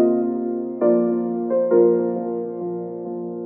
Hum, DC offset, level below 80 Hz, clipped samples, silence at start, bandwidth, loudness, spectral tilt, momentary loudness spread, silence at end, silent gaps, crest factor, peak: none; under 0.1%; under -90 dBFS; under 0.1%; 0 s; 2.5 kHz; -21 LUFS; -12 dB/octave; 13 LU; 0 s; none; 14 dB; -6 dBFS